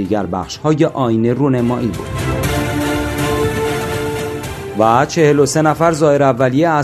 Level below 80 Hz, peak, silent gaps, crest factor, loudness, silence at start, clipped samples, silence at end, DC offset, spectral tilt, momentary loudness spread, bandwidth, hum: -36 dBFS; 0 dBFS; none; 14 dB; -15 LUFS; 0 s; under 0.1%; 0 s; under 0.1%; -6 dB/octave; 9 LU; 14 kHz; none